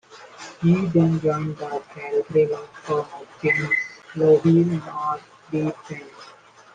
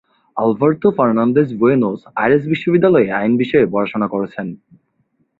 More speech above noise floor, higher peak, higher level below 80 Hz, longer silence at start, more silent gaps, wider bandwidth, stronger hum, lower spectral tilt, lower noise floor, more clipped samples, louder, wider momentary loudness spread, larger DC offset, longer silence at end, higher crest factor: second, 27 dB vs 49 dB; second, -6 dBFS vs -2 dBFS; about the same, -60 dBFS vs -56 dBFS; second, 0.1 s vs 0.35 s; neither; first, 9 kHz vs 4.6 kHz; neither; second, -8 dB/octave vs -10 dB/octave; second, -48 dBFS vs -64 dBFS; neither; second, -22 LUFS vs -16 LUFS; first, 18 LU vs 8 LU; neither; second, 0.45 s vs 0.85 s; about the same, 16 dB vs 14 dB